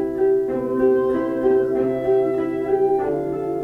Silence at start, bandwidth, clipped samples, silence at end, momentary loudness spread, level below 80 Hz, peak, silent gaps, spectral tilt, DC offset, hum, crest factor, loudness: 0 s; 3.5 kHz; under 0.1%; 0 s; 4 LU; -50 dBFS; -6 dBFS; none; -9 dB/octave; under 0.1%; none; 12 dB; -20 LUFS